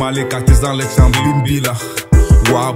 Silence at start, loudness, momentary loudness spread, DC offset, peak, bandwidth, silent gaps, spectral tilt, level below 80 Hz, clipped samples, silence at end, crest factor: 0 s; -13 LUFS; 6 LU; under 0.1%; 0 dBFS; 16.5 kHz; none; -5.5 dB/octave; -16 dBFS; under 0.1%; 0 s; 12 dB